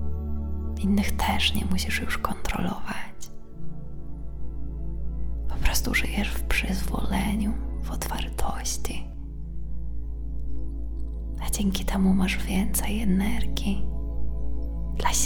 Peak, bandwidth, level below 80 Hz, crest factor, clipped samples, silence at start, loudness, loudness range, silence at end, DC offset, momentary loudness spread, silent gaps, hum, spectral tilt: -6 dBFS; 19 kHz; -30 dBFS; 20 dB; under 0.1%; 0 s; -28 LUFS; 7 LU; 0 s; under 0.1%; 14 LU; none; none; -4 dB/octave